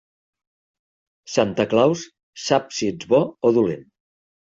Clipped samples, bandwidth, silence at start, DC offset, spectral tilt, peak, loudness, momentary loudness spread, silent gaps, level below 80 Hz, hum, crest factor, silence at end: under 0.1%; 8 kHz; 1.3 s; under 0.1%; -5 dB/octave; -4 dBFS; -21 LUFS; 12 LU; 2.23-2.33 s; -60 dBFS; none; 18 dB; 0.65 s